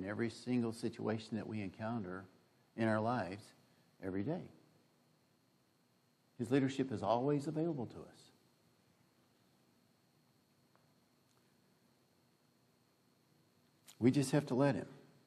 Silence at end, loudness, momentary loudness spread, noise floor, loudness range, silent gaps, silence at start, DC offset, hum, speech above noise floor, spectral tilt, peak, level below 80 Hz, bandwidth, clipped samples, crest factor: 0.25 s; -38 LUFS; 15 LU; -75 dBFS; 7 LU; none; 0 s; under 0.1%; none; 37 dB; -7 dB/octave; -20 dBFS; -82 dBFS; 14 kHz; under 0.1%; 22 dB